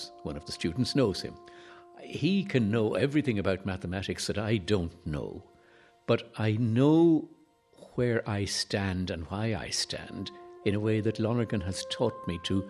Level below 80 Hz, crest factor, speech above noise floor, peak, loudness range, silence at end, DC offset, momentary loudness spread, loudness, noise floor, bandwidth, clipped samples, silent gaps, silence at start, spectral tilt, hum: -54 dBFS; 18 dB; 31 dB; -12 dBFS; 4 LU; 0 s; under 0.1%; 14 LU; -30 LUFS; -60 dBFS; 13 kHz; under 0.1%; none; 0 s; -5.5 dB/octave; none